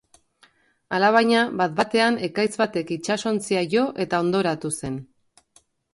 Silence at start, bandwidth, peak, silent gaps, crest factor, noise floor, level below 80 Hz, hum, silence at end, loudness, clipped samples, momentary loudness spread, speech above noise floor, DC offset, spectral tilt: 0.9 s; 11.5 kHz; -4 dBFS; none; 18 dB; -61 dBFS; -60 dBFS; none; 0.9 s; -22 LUFS; under 0.1%; 10 LU; 39 dB; under 0.1%; -4.5 dB/octave